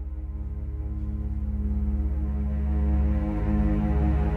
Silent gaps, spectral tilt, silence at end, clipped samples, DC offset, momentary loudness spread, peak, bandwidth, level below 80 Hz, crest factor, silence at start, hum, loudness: none; -11 dB/octave; 0 s; under 0.1%; under 0.1%; 9 LU; -14 dBFS; 3.1 kHz; -26 dBFS; 12 dB; 0 s; none; -28 LUFS